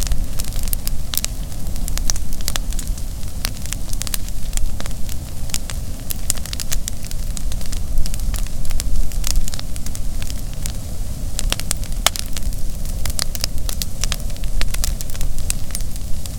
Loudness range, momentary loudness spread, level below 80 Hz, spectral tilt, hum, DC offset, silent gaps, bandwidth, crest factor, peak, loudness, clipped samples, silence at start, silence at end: 3 LU; 7 LU; -22 dBFS; -3 dB/octave; none; under 0.1%; none; 18.5 kHz; 16 dB; 0 dBFS; -25 LUFS; under 0.1%; 0 s; 0 s